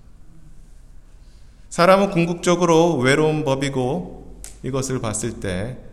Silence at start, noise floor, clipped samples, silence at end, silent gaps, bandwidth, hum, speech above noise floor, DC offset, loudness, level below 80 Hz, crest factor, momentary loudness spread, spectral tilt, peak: 0.1 s; -43 dBFS; under 0.1%; 0 s; none; 14 kHz; none; 25 dB; under 0.1%; -19 LUFS; -44 dBFS; 20 dB; 15 LU; -5 dB/octave; 0 dBFS